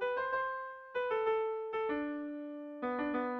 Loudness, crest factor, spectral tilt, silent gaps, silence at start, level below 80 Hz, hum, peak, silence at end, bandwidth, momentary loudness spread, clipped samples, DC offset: -37 LUFS; 14 dB; -6.5 dB/octave; none; 0 s; -72 dBFS; none; -22 dBFS; 0 s; 5.4 kHz; 9 LU; under 0.1%; under 0.1%